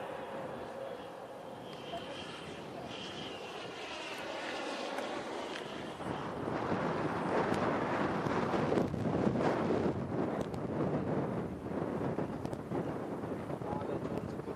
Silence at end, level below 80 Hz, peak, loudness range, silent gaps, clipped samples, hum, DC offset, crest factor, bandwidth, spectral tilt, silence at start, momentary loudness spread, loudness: 0 s; -62 dBFS; -16 dBFS; 10 LU; none; under 0.1%; none; under 0.1%; 20 dB; 14.5 kHz; -6.5 dB/octave; 0 s; 11 LU; -37 LUFS